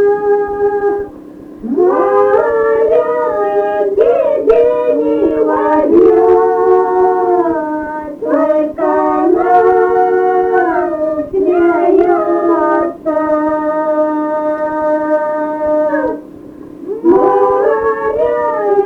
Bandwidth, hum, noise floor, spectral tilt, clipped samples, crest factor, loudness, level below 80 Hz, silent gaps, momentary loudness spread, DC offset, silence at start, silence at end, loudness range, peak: 4.4 kHz; none; -32 dBFS; -8 dB/octave; under 0.1%; 10 dB; -12 LUFS; -46 dBFS; none; 7 LU; under 0.1%; 0 s; 0 s; 4 LU; 0 dBFS